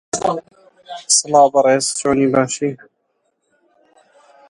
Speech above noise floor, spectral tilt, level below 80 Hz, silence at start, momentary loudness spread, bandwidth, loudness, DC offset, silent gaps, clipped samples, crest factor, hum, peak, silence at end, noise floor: 53 dB; -3 dB/octave; -56 dBFS; 0.15 s; 19 LU; 11.5 kHz; -15 LUFS; under 0.1%; none; under 0.1%; 18 dB; none; 0 dBFS; 1.75 s; -68 dBFS